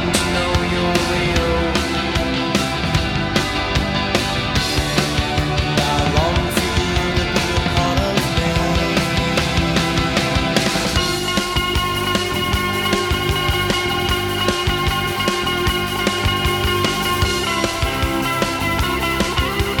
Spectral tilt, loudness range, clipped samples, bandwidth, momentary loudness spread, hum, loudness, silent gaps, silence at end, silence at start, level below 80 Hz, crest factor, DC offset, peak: -4 dB/octave; 1 LU; under 0.1%; over 20 kHz; 2 LU; none; -18 LUFS; none; 0 s; 0 s; -28 dBFS; 16 dB; under 0.1%; -2 dBFS